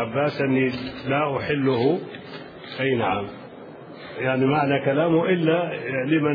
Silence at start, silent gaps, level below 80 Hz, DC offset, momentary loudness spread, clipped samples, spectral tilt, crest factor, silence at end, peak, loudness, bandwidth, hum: 0 s; none; -60 dBFS; under 0.1%; 18 LU; under 0.1%; -9 dB/octave; 16 dB; 0 s; -6 dBFS; -23 LUFS; 5.2 kHz; none